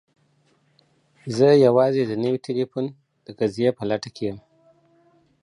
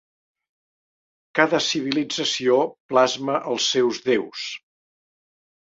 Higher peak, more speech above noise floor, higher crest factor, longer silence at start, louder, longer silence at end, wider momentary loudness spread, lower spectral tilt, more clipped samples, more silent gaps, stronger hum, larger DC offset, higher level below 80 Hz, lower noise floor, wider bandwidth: about the same, -4 dBFS vs -2 dBFS; second, 43 dB vs over 68 dB; about the same, 18 dB vs 22 dB; about the same, 1.25 s vs 1.35 s; about the same, -21 LUFS vs -22 LUFS; about the same, 1.05 s vs 1.1 s; first, 15 LU vs 10 LU; first, -7 dB/octave vs -3 dB/octave; neither; second, none vs 2.80-2.89 s; neither; neither; first, -64 dBFS vs -70 dBFS; second, -63 dBFS vs under -90 dBFS; first, 11 kHz vs 7.8 kHz